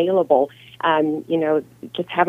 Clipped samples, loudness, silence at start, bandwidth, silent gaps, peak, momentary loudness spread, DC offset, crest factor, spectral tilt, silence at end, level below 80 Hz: under 0.1%; -20 LUFS; 0 s; 15 kHz; none; -2 dBFS; 10 LU; under 0.1%; 18 dB; -7.5 dB/octave; 0 s; -68 dBFS